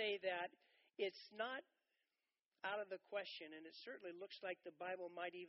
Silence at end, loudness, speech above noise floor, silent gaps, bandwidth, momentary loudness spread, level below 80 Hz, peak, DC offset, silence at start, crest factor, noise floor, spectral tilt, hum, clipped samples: 0 s; -49 LUFS; over 40 dB; 2.46-2.51 s; 5.8 kHz; 8 LU; under -90 dBFS; -32 dBFS; under 0.1%; 0 s; 18 dB; under -90 dBFS; 0 dB/octave; none; under 0.1%